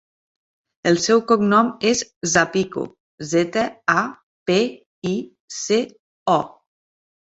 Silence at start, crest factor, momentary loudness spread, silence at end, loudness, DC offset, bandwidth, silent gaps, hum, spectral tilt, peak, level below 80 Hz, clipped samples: 0.85 s; 20 dB; 14 LU; 0.8 s; -20 LUFS; under 0.1%; 8.2 kHz; 2.16-2.21 s, 3.00-3.18 s, 4.23-4.46 s, 4.86-5.02 s, 5.40-5.48 s, 5.99-6.26 s; none; -4 dB/octave; -2 dBFS; -60 dBFS; under 0.1%